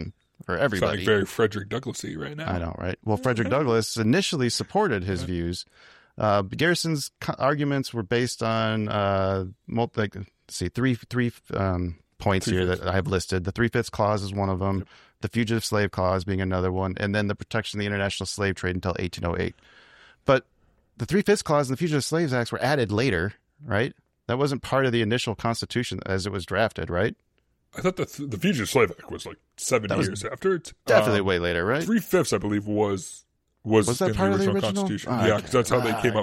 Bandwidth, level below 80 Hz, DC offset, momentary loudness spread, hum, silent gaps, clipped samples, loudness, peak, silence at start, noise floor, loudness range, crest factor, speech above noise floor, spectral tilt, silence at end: 16 kHz; -50 dBFS; under 0.1%; 9 LU; none; none; under 0.1%; -25 LUFS; -4 dBFS; 0 s; -54 dBFS; 3 LU; 20 dB; 29 dB; -5.5 dB/octave; 0 s